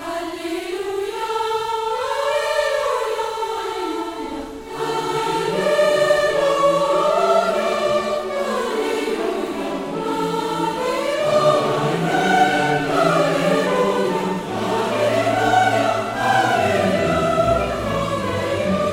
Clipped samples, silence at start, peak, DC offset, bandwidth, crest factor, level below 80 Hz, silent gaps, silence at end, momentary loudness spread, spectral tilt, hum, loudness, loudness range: under 0.1%; 0 s; -4 dBFS; under 0.1%; 16.5 kHz; 16 dB; -46 dBFS; none; 0 s; 8 LU; -4.5 dB/octave; none; -20 LUFS; 5 LU